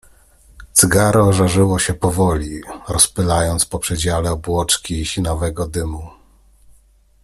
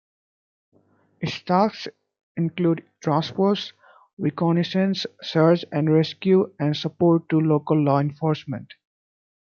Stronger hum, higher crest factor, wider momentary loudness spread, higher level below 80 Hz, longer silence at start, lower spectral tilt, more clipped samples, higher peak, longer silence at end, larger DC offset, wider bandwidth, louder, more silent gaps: neither; about the same, 18 dB vs 18 dB; about the same, 11 LU vs 11 LU; first, -34 dBFS vs -68 dBFS; second, 0.6 s vs 1.2 s; second, -4 dB/octave vs -8 dB/octave; neither; first, 0 dBFS vs -4 dBFS; first, 1.15 s vs 0.95 s; neither; first, 15 kHz vs 7 kHz; first, -16 LUFS vs -22 LUFS; second, none vs 2.23-2.35 s, 4.13-4.17 s